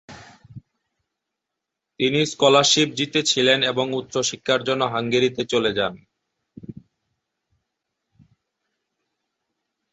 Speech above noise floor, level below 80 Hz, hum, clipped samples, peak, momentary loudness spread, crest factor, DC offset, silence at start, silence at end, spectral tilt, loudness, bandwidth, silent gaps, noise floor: 63 dB; -62 dBFS; none; under 0.1%; -2 dBFS; 9 LU; 22 dB; under 0.1%; 0.1 s; 3.2 s; -3 dB/octave; -20 LUFS; 8.2 kHz; none; -83 dBFS